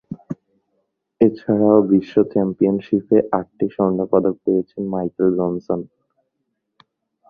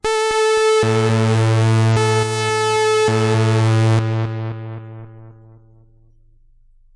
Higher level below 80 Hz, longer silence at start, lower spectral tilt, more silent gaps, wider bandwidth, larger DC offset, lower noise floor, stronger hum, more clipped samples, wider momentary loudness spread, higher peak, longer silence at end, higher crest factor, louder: second, -56 dBFS vs -50 dBFS; about the same, 0.1 s vs 0.05 s; first, -11 dB/octave vs -5.5 dB/octave; neither; second, 5 kHz vs 11.5 kHz; neither; first, -75 dBFS vs -50 dBFS; neither; neither; about the same, 11 LU vs 13 LU; first, -2 dBFS vs -8 dBFS; second, 1.45 s vs 1.65 s; first, 18 dB vs 10 dB; second, -19 LUFS vs -16 LUFS